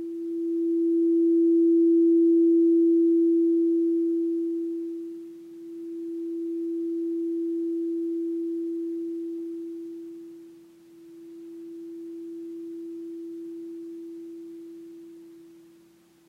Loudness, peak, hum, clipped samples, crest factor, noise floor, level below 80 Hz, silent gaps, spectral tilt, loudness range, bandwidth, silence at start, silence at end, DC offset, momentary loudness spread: -24 LUFS; -16 dBFS; none; under 0.1%; 10 dB; -58 dBFS; -84 dBFS; none; -8 dB/octave; 19 LU; 0.7 kHz; 0 s; 0.75 s; under 0.1%; 22 LU